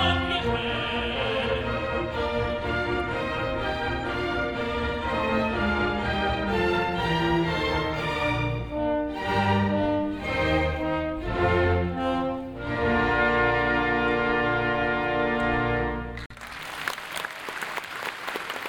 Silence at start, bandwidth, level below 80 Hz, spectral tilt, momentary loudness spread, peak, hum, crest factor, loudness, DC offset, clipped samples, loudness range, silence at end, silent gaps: 0 s; 19 kHz; -40 dBFS; -6 dB/octave; 9 LU; -8 dBFS; none; 18 dB; -26 LUFS; under 0.1%; under 0.1%; 4 LU; 0 s; 16.26-16.30 s